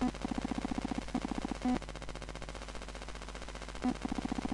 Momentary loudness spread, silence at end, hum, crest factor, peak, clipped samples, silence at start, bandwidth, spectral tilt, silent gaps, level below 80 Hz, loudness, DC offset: 9 LU; 0 s; none; 20 dB; -18 dBFS; under 0.1%; 0 s; 11.5 kHz; -5.5 dB/octave; none; -46 dBFS; -39 LUFS; under 0.1%